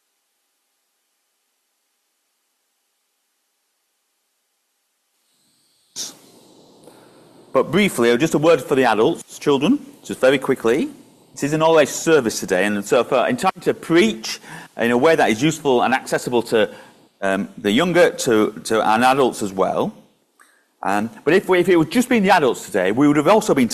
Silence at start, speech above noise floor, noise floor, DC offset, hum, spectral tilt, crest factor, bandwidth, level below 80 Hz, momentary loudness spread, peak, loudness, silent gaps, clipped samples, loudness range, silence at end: 5.95 s; 53 dB; -70 dBFS; under 0.1%; none; -4.5 dB/octave; 16 dB; 14.5 kHz; -58 dBFS; 10 LU; -4 dBFS; -18 LUFS; none; under 0.1%; 9 LU; 0 s